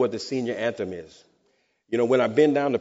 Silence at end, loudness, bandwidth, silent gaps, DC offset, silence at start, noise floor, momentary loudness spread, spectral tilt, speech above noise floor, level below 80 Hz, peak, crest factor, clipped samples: 0 s; -24 LUFS; 8 kHz; none; under 0.1%; 0 s; -69 dBFS; 13 LU; -4.5 dB/octave; 45 dB; -68 dBFS; -8 dBFS; 18 dB; under 0.1%